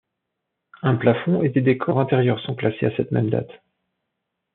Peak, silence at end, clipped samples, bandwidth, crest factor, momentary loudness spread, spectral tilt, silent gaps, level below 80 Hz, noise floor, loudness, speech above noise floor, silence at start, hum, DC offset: -4 dBFS; 1 s; under 0.1%; 4.2 kHz; 18 dB; 6 LU; -7 dB/octave; none; -64 dBFS; -80 dBFS; -21 LUFS; 60 dB; 0.85 s; none; under 0.1%